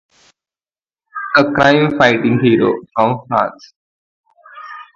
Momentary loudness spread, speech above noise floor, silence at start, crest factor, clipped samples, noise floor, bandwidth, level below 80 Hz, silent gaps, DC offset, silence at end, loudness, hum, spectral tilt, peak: 20 LU; over 77 dB; 1.15 s; 16 dB; under 0.1%; under -90 dBFS; 7.4 kHz; -50 dBFS; 3.76-4.24 s; under 0.1%; 0.15 s; -14 LUFS; none; -6.5 dB/octave; 0 dBFS